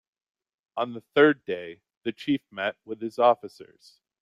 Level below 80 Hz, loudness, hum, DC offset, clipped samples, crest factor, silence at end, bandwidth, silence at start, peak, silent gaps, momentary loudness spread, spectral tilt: -74 dBFS; -26 LUFS; none; under 0.1%; under 0.1%; 20 dB; 0.6 s; 11 kHz; 0.75 s; -6 dBFS; 1.97-2.01 s; 15 LU; -6.5 dB/octave